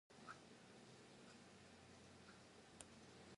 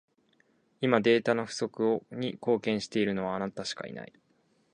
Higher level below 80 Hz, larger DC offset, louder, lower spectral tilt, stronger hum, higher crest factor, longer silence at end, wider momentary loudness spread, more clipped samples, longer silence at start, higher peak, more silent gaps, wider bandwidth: second, -82 dBFS vs -70 dBFS; neither; second, -63 LUFS vs -29 LUFS; second, -3.5 dB/octave vs -5.5 dB/octave; neither; about the same, 28 dB vs 24 dB; second, 0 s vs 0.65 s; second, 4 LU vs 13 LU; neither; second, 0.1 s vs 0.8 s; second, -36 dBFS vs -6 dBFS; neither; about the same, 11 kHz vs 10 kHz